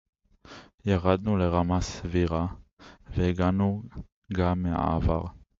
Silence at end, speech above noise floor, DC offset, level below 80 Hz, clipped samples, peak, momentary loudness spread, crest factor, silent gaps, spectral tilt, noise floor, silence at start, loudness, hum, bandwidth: 0.25 s; 24 dB; under 0.1%; -38 dBFS; under 0.1%; -8 dBFS; 11 LU; 20 dB; 0.74-0.78 s, 2.73-2.77 s, 4.12-4.22 s; -7.5 dB/octave; -50 dBFS; 0.45 s; -27 LUFS; none; 7.8 kHz